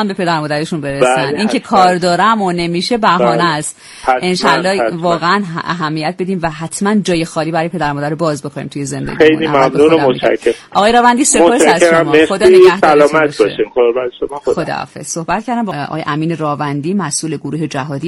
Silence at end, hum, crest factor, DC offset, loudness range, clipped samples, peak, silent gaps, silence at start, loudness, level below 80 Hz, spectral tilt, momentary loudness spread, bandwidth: 0 s; none; 12 dB; under 0.1%; 8 LU; 0.3%; 0 dBFS; none; 0 s; -13 LUFS; -46 dBFS; -4.5 dB/octave; 11 LU; 12 kHz